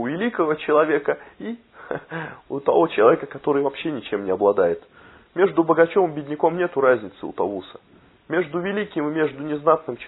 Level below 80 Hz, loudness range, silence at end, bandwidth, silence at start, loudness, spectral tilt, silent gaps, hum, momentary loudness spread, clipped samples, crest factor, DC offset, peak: -64 dBFS; 3 LU; 0 s; 4.1 kHz; 0 s; -21 LUFS; -10.5 dB/octave; none; none; 15 LU; under 0.1%; 20 dB; under 0.1%; -2 dBFS